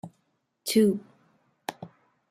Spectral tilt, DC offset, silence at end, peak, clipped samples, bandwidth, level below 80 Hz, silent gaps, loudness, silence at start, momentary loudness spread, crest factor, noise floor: -5 dB/octave; under 0.1%; 0.45 s; -10 dBFS; under 0.1%; 16 kHz; -72 dBFS; none; -26 LUFS; 0.05 s; 25 LU; 20 dB; -75 dBFS